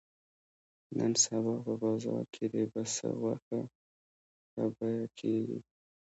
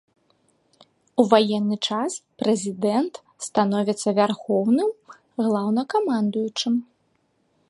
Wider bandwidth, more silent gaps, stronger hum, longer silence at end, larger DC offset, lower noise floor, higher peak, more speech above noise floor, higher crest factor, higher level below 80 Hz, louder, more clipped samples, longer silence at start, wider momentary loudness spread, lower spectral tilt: second, 8.2 kHz vs 11.5 kHz; first, 3.42-3.51 s, 3.75-4.57 s vs none; neither; second, 0.5 s vs 0.85 s; neither; first, under -90 dBFS vs -68 dBFS; second, -14 dBFS vs -2 dBFS; first, over 57 dB vs 46 dB; about the same, 20 dB vs 22 dB; second, -78 dBFS vs -72 dBFS; second, -34 LUFS vs -23 LUFS; neither; second, 0.9 s vs 1.15 s; first, 12 LU vs 9 LU; about the same, -4.5 dB/octave vs -5 dB/octave